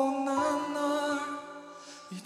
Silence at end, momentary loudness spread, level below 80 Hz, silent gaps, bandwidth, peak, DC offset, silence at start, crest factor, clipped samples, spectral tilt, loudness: 0 s; 17 LU; -74 dBFS; none; 13 kHz; -16 dBFS; under 0.1%; 0 s; 14 dB; under 0.1%; -4 dB/octave; -31 LUFS